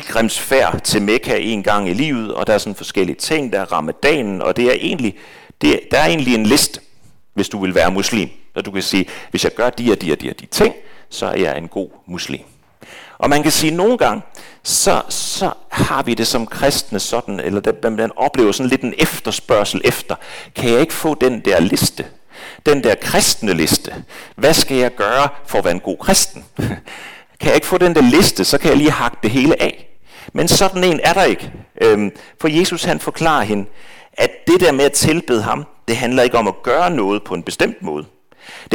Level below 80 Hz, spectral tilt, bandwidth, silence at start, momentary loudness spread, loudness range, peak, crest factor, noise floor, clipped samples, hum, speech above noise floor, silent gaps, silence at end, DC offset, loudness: -40 dBFS; -3.5 dB/octave; 19 kHz; 0 s; 12 LU; 4 LU; -4 dBFS; 12 dB; -52 dBFS; under 0.1%; none; 37 dB; none; 0 s; under 0.1%; -16 LUFS